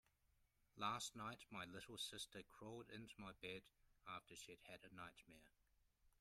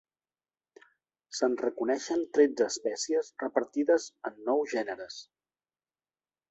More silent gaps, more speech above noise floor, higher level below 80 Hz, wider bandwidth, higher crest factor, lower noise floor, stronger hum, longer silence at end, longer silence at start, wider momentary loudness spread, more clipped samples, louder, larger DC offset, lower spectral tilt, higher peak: neither; second, 27 dB vs over 61 dB; about the same, -80 dBFS vs -78 dBFS; first, 15.5 kHz vs 8.2 kHz; about the same, 24 dB vs 20 dB; second, -82 dBFS vs under -90 dBFS; neither; second, 0.1 s vs 1.3 s; second, 0.4 s vs 1.3 s; about the same, 12 LU vs 14 LU; neither; second, -54 LUFS vs -30 LUFS; neither; about the same, -3 dB/octave vs -2.5 dB/octave; second, -32 dBFS vs -10 dBFS